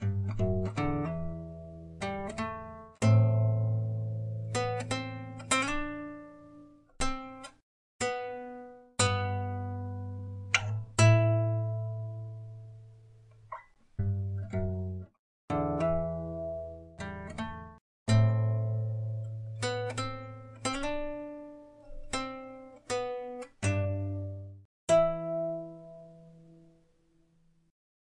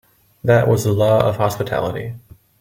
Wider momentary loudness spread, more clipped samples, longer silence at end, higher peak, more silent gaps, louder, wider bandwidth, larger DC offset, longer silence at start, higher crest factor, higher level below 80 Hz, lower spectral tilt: first, 21 LU vs 14 LU; neither; first, 1.5 s vs 0.4 s; second, -10 dBFS vs 0 dBFS; first, 7.62-7.99 s, 15.19-15.48 s, 17.81-18.06 s, 24.65-24.87 s vs none; second, -32 LUFS vs -17 LUFS; second, 11 kHz vs 17 kHz; neither; second, 0 s vs 0.45 s; about the same, 22 dB vs 18 dB; about the same, -50 dBFS vs -48 dBFS; about the same, -5.5 dB/octave vs -6.5 dB/octave